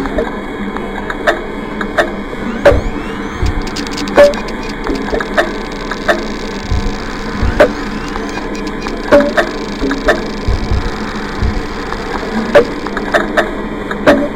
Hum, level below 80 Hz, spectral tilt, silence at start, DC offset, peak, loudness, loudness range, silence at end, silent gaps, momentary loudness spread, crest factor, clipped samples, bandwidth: none; -24 dBFS; -5.5 dB/octave; 0 s; under 0.1%; 0 dBFS; -15 LUFS; 3 LU; 0 s; none; 10 LU; 14 dB; 0.5%; 16.5 kHz